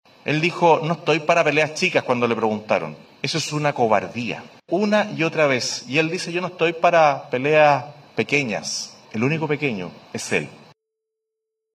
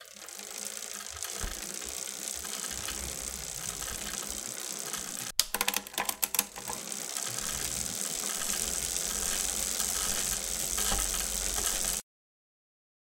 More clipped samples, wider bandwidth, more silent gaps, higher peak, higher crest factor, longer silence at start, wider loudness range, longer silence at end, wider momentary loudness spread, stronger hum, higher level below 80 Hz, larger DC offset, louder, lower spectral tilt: neither; second, 13.5 kHz vs 17 kHz; neither; about the same, -4 dBFS vs -4 dBFS; second, 18 dB vs 30 dB; first, 0.25 s vs 0 s; about the same, 5 LU vs 6 LU; first, 1.2 s vs 1 s; first, 11 LU vs 8 LU; neither; second, -70 dBFS vs -48 dBFS; neither; first, -20 LUFS vs -31 LUFS; first, -4.5 dB/octave vs 0 dB/octave